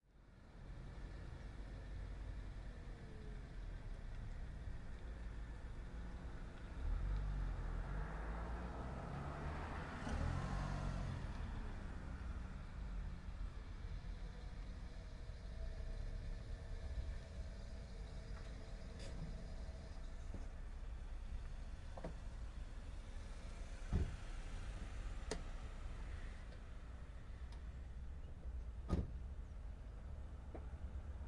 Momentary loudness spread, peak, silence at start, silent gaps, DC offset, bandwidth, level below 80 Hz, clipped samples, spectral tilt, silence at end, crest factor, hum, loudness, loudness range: 9 LU; -26 dBFS; 0.05 s; none; under 0.1%; 11 kHz; -48 dBFS; under 0.1%; -6.5 dB/octave; 0 s; 20 dB; none; -51 LUFS; 7 LU